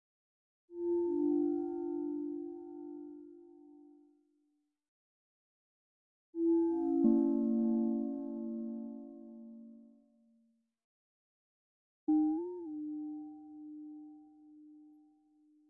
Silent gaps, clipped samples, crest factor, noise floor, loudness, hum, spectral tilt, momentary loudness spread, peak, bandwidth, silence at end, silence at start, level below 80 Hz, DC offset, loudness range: 4.88-6.33 s, 10.84-12.07 s; under 0.1%; 20 dB; -80 dBFS; -35 LUFS; none; -12 dB/octave; 21 LU; -18 dBFS; 1.7 kHz; 0.8 s; 0.7 s; -76 dBFS; under 0.1%; 17 LU